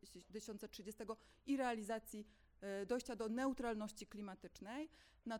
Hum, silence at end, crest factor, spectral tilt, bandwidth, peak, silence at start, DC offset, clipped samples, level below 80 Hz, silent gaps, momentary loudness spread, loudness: none; 0 s; 18 dB; -4.5 dB/octave; 18.5 kHz; -28 dBFS; 0.05 s; under 0.1%; under 0.1%; -70 dBFS; none; 13 LU; -47 LUFS